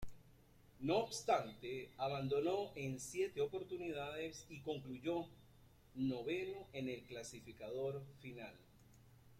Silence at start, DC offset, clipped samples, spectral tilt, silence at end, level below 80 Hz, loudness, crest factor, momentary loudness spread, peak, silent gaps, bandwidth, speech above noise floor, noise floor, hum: 0 s; under 0.1%; under 0.1%; -5 dB/octave; 0 s; -68 dBFS; -43 LUFS; 20 dB; 14 LU; -24 dBFS; none; 16 kHz; 24 dB; -66 dBFS; none